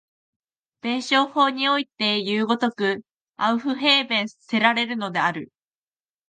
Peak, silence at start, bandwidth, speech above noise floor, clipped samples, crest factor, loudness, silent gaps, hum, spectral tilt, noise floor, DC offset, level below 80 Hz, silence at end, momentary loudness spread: -4 dBFS; 0.85 s; 9.4 kHz; over 68 dB; under 0.1%; 20 dB; -22 LUFS; 3.11-3.25 s; none; -4 dB/octave; under -90 dBFS; under 0.1%; -76 dBFS; 0.85 s; 8 LU